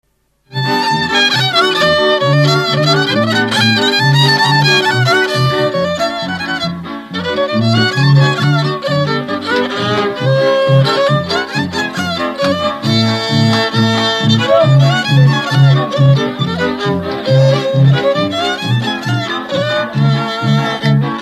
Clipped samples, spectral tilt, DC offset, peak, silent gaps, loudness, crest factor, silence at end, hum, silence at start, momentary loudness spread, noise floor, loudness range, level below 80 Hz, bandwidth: under 0.1%; -5.5 dB/octave; under 0.1%; 0 dBFS; none; -12 LUFS; 12 dB; 0 s; none; 0.5 s; 7 LU; -50 dBFS; 3 LU; -48 dBFS; 13 kHz